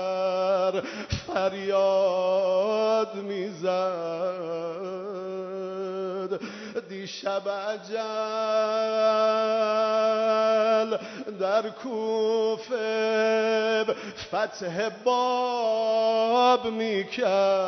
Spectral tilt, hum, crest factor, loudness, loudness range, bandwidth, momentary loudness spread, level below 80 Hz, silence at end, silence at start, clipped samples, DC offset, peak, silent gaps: -4.5 dB/octave; none; 16 dB; -26 LUFS; 8 LU; 6.4 kHz; 11 LU; -60 dBFS; 0 s; 0 s; under 0.1%; under 0.1%; -10 dBFS; none